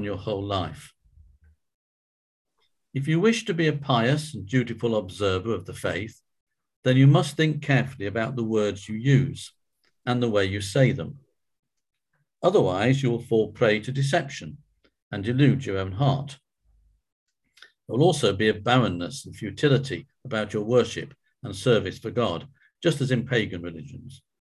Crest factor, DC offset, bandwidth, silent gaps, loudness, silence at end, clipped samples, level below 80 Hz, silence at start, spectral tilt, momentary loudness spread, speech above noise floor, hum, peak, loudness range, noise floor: 20 dB; under 0.1%; 12 kHz; 1.74-2.45 s, 6.41-6.47 s, 6.76-6.83 s, 11.59-11.63 s, 15.02-15.11 s, 17.12-17.26 s; -24 LUFS; 0.25 s; under 0.1%; -52 dBFS; 0 s; -6.5 dB/octave; 14 LU; 40 dB; none; -6 dBFS; 4 LU; -64 dBFS